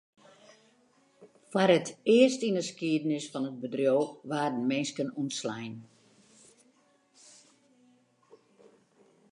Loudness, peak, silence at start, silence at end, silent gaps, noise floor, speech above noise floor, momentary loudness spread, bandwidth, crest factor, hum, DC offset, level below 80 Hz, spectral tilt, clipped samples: -29 LUFS; -10 dBFS; 1.2 s; 3.5 s; none; -67 dBFS; 38 dB; 12 LU; 11 kHz; 22 dB; none; under 0.1%; -84 dBFS; -5 dB/octave; under 0.1%